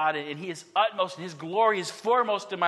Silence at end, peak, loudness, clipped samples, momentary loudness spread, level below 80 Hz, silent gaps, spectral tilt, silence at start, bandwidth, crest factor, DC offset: 0 s; -10 dBFS; -27 LUFS; under 0.1%; 10 LU; -82 dBFS; none; -3.5 dB/octave; 0 s; 12.5 kHz; 18 dB; under 0.1%